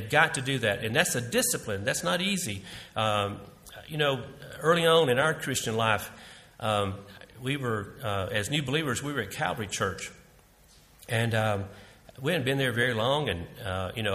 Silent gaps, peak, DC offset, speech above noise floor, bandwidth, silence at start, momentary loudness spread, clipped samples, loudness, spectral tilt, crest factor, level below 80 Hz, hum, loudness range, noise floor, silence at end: none; -6 dBFS; under 0.1%; 29 dB; 15.5 kHz; 0 s; 14 LU; under 0.1%; -28 LUFS; -4 dB/octave; 24 dB; -58 dBFS; none; 5 LU; -58 dBFS; 0 s